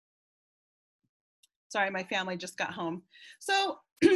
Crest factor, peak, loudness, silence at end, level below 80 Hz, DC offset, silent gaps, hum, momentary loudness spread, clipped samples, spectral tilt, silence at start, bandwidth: 22 dB; -10 dBFS; -32 LUFS; 0 s; -72 dBFS; under 0.1%; 3.92-3.96 s; none; 12 LU; under 0.1%; -4 dB/octave; 1.7 s; 12.5 kHz